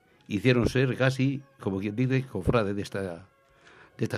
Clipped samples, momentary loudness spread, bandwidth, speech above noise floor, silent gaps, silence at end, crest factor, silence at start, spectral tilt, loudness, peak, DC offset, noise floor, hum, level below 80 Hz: under 0.1%; 11 LU; 12.5 kHz; 30 dB; none; 0 s; 20 dB; 0.3 s; -7 dB/octave; -28 LUFS; -8 dBFS; under 0.1%; -56 dBFS; none; -48 dBFS